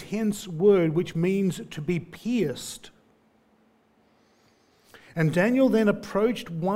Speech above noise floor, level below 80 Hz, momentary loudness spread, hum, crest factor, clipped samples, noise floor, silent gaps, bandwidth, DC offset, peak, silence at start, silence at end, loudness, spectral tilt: 39 dB; -60 dBFS; 12 LU; none; 18 dB; under 0.1%; -63 dBFS; none; 16 kHz; under 0.1%; -8 dBFS; 0 s; 0 s; -25 LUFS; -6.5 dB/octave